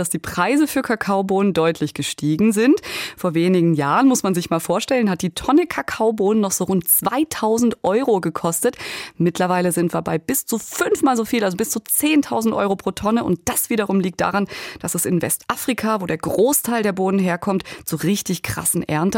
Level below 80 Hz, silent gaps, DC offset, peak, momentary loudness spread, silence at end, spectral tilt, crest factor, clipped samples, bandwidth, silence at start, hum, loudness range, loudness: -52 dBFS; none; under 0.1%; -4 dBFS; 7 LU; 0 s; -4.5 dB/octave; 16 dB; under 0.1%; 17 kHz; 0 s; none; 2 LU; -19 LUFS